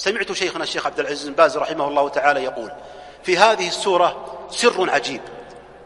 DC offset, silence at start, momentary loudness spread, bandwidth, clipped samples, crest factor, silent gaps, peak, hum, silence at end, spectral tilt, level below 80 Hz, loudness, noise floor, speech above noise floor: under 0.1%; 0 s; 17 LU; 11.5 kHz; under 0.1%; 20 dB; none; 0 dBFS; none; 0 s; -2.5 dB/octave; -58 dBFS; -19 LUFS; -40 dBFS; 20 dB